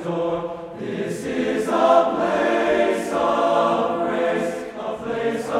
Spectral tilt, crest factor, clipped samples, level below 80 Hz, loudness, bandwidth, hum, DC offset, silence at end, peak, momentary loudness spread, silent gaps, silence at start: -5.5 dB/octave; 18 dB; under 0.1%; -56 dBFS; -21 LUFS; 14 kHz; none; under 0.1%; 0 s; -4 dBFS; 12 LU; none; 0 s